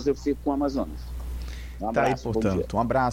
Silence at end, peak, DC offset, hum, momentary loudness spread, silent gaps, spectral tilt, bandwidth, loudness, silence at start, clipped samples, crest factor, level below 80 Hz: 0 s; -10 dBFS; under 0.1%; none; 12 LU; none; -7 dB/octave; 16.5 kHz; -27 LUFS; 0 s; under 0.1%; 16 dB; -38 dBFS